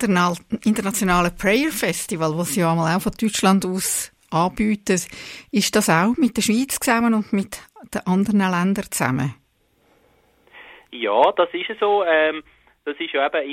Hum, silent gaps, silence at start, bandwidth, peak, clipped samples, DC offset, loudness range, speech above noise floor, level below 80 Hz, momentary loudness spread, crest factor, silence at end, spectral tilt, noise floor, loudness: none; none; 0 s; 16.5 kHz; -2 dBFS; under 0.1%; under 0.1%; 4 LU; 42 dB; -48 dBFS; 10 LU; 18 dB; 0 s; -4.5 dB/octave; -62 dBFS; -20 LUFS